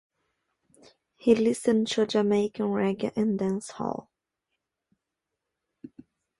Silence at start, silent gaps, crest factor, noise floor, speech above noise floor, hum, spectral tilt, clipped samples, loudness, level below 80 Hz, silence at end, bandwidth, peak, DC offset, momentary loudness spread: 1.25 s; none; 20 dB; -85 dBFS; 60 dB; none; -5.5 dB/octave; under 0.1%; -26 LUFS; -66 dBFS; 0.55 s; 11.5 kHz; -8 dBFS; under 0.1%; 11 LU